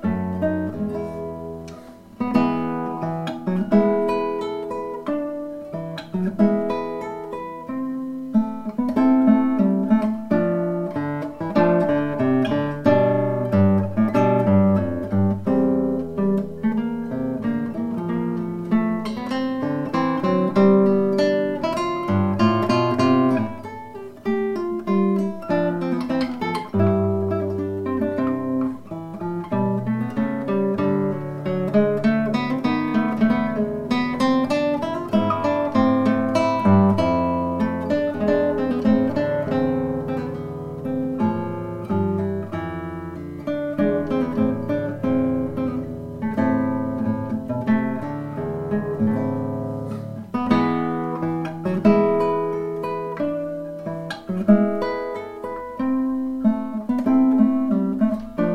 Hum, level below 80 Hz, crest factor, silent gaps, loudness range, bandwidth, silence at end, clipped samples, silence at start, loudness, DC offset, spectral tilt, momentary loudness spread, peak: none; -52 dBFS; 18 dB; none; 5 LU; 10 kHz; 0 s; under 0.1%; 0 s; -22 LUFS; under 0.1%; -8.5 dB/octave; 11 LU; -4 dBFS